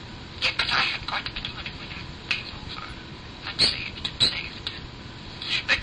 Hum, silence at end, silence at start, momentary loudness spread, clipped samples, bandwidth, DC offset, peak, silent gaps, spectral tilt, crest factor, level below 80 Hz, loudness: none; 0 s; 0 s; 17 LU; under 0.1%; 10.5 kHz; under 0.1%; -8 dBFS; none; -2.5 dB/octave; 20 dB; -46 dBFS; -26 LUFS